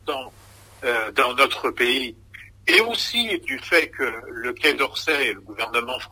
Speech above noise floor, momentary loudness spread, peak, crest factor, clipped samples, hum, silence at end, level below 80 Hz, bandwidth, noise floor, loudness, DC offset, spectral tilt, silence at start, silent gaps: 26 dB; 12 LU; -2 dBFS; 22 dB; under 0.1%; none; 0.05 s; -56 dBFS; 16 kHz; -48 dBFS; -21 LUFS; under 0.1%; -2 dB/octave; 0.05 s; none